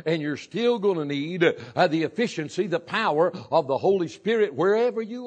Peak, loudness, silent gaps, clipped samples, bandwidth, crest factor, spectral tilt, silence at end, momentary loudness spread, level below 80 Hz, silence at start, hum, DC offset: -6 dBFS; -24 LUFS; none; under 0.1%; 9 kHz; 18 dB; -6 dB/octave; 0 s; 5 LU; -74 dBFS; 0.05 s; none; under 0.1%